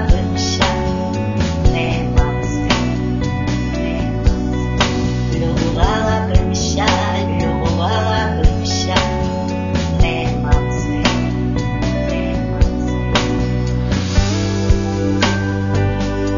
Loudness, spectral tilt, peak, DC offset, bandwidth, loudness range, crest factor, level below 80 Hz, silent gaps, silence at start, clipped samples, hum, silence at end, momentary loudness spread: -17 LUFS; -5.5 dB/octave; 0 dBFS; 0.5%; 7.4 kHz; 1 LU; 16 dB; -22 dBFS; none; 0 s; under 0.1%; none; 0 s; 4 LU